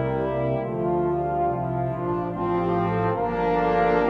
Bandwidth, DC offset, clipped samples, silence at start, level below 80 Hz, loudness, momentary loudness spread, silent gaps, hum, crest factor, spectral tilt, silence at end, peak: 6.2 kHz; under 0.1%; under 0.1%; 0 s; -44 dBFS; -24 LUFS; 5 LU; none; none; 14 dB; -9.5 dB/octave; 0 s; -10 dBFS